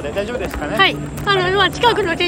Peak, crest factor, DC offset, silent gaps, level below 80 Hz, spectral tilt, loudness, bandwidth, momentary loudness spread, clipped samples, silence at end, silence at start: -2 dBFS; 16 dB; under 0.1%; none; -36 dBFS; -4.5 dB/octave; -16 LUFS; 17 kHz; 9 LU; under 0.1%; 0 s; 0 s